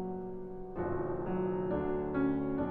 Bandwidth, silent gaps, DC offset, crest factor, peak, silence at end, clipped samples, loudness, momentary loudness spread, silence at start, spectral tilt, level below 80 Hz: 3.9 kHz; none; under 0.1%; 14 dB; -20 dBFS; 0 s; under 0.1%; -35 LUFS; 10 LU; 0 s; -11.5 dB/octave; -50 dBFS